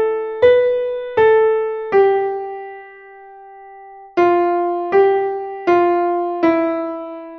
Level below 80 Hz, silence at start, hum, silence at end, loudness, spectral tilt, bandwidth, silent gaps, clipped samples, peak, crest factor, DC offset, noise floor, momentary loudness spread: -56 dBFS; 0 s; none; 0 s; -16 LUFS; -7 dB/octave; 6.2 kHz; none; under 0.1%; -2 dBFS; 16 dB; under 0.1%; -39 dBFS; 13 LU